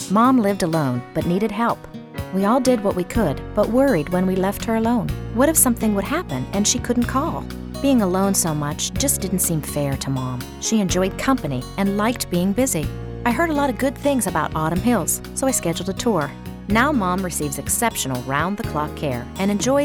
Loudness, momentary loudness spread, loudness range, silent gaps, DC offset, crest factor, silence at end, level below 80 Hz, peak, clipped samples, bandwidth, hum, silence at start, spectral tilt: -20 LUFS; 7 LU; 2 LU; none; under 0.1%; 18 dB; 0 s; -38 dBFS; -4 dBFS; under 0.1%; over 20 kHz; none; 0 s; -4.5 dB/octave